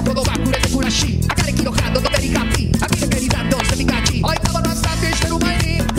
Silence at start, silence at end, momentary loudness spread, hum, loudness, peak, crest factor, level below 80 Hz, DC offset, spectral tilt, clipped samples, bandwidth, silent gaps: 0 s; 0 s; 1 LU; none; -17 LUFS; -2 dBFS; 14 dB; -24 dBFS; under 0.1%; -4.5 dB/octave; under 0.1%; 16.5 kHz; none